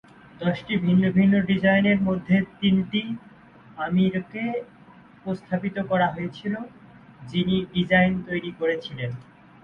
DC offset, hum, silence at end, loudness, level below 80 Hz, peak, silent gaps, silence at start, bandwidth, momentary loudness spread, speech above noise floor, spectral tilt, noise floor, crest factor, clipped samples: under 0.1%; none; 0.4 s; -24 LUFS; -54 dBFS; -6 dBFS; none; 0.4 s; 5.4 kHz; 13 LU; 27 dB; -8.5 dB/octave; -50 dBFS; 18 dB; under 0.1%